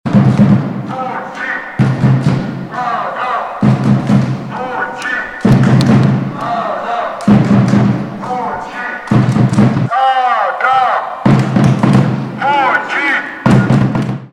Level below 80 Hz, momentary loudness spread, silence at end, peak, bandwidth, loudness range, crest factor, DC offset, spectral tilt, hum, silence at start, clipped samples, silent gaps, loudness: -40 dBFS; 10 LU; 0.05 s; -2 dBFS; 10.5 kHz; 3 LU; 10 dB; under 0.1%; -7.5 dB/octave; none; 0.05 s; under 0.1%; none; -13 LUFS